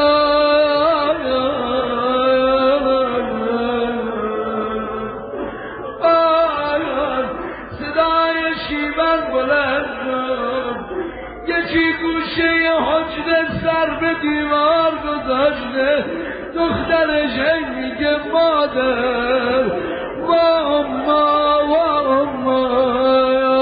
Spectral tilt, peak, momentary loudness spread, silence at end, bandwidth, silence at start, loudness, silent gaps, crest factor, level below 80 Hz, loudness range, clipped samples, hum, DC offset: -10 dB/octave; -4 dBFS; 9 LU; 0 s; 5 kHz; 0 s; -17 LUFS; none; 14 dB; -42 dBFS; 3 LU; under 0.1%; none; under 0.1%